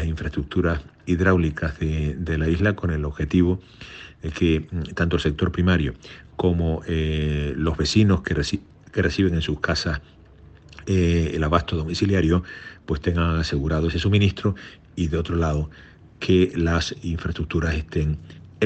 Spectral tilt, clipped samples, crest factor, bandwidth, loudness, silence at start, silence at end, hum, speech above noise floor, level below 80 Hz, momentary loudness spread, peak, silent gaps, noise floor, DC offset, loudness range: -6.5 dB/octave; under 0.1%; 18 dB; 8.4 kHz; -23 LUFS; 0 s; 0 s; none; 26 dB; -36 dBFS; 11 LU; -4 dBFS; none; -48 dBFS; under 0.1%; 2 LU